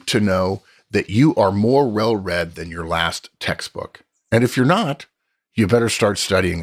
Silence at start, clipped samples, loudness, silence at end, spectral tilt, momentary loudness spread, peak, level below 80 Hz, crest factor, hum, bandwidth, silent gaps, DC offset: 0.05 s; under 0.1%; -19 LUFS; 0 s; -5.5 dB/octave; 13 LU; -4 dBFS; -48 dBFS; 16 dB; none; 15.5 kHz; none; under 0.1%